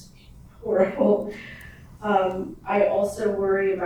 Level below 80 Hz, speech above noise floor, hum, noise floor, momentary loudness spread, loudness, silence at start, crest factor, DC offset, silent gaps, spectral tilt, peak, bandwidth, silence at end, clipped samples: -52 dBFS; 25 dB; none; -47 dBFS; 15 LU; -23 LUFS; 0 s; 18 dB; under 0.1%; none; -6.5 dB/octave; -6 dBFS; 14 kHz; 0 s; under 0.1%